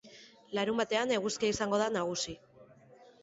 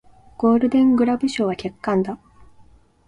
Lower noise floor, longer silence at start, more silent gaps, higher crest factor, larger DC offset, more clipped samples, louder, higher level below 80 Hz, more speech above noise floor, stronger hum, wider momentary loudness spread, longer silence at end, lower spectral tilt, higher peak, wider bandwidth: first, -58 dBFS vs -51 dBFS; second, 0.05 s vs 0.4 s; neither; about the same, 18 dB vs 14 dB; neither; neither; second, -32 LUFS vs -20 LUFS; second, -66 dBFS vs -54 dBFS; second, 27 dB vs 32 dB; neither; about the same, 9 LU vs 11 LU; second, 0.2 s vs 0.9 s; second, -3.5 dB/octave vs -6.5 dB/octave; second, -16 dBFS vs -6 dBFS; second, 8 kHz vs 10.5 kHz